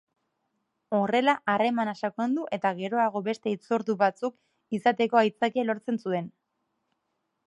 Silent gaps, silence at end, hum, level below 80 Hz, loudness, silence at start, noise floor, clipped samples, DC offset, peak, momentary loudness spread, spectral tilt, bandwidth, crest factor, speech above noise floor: none; 1.2 s; none; -80 dBFS; -27 LUFS; 0.9 s; -79 dBFS; under 0.1%; under 0.1%; -8 dBFS; 8 LU; -6 dB/octave; 11 kHz; 20 dB; 52 dB